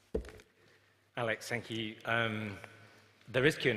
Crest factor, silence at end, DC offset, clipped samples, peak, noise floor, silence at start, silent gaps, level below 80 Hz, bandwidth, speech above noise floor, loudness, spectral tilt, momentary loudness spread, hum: 24 dB; 0 s; under 0.1%; under 0.1%; -12 dBFS; -67 dBFS; 0.15 s; none; -56 dBFS; 15.5 kHz; 33 dB; -35 LUFS; -5 dB/octave; 17 LU; none